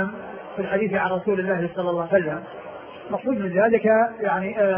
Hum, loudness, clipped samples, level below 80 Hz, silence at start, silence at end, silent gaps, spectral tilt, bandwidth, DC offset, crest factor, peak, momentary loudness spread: none; -23 LUFS; under 0.1%; -60 dBFS; 0 s; 0 s; none; -11 dB/octave; 3.5 kHz; under 0.1%; 18 dB; -6 dBFS; 17 LU